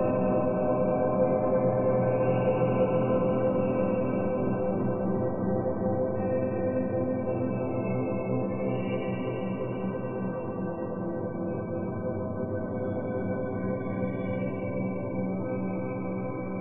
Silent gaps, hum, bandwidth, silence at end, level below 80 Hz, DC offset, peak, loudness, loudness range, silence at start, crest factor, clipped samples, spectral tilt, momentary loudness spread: none; none; 3.6 kHz; 0 s; -54 dBFS; under 0.1%; -12 dBFS; -29 LUFS; 7 LU; 0 s; 16 dB; under 0.1%; -12.5 dB/octave; 7 LU